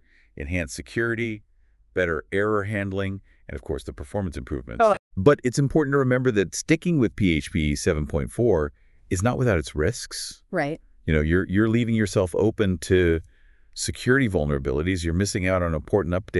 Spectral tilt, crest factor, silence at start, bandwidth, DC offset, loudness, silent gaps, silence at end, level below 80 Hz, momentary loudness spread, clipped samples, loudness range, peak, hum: -6 dB/octave; 18 dB; 0.35 s; 12 kHz; under 0.1%; -24 LUFS; 4.99-5.11 s; 0 s; -40 dBFS; 11 LU; under 0.1%; 5 LU; -4 dBFS; none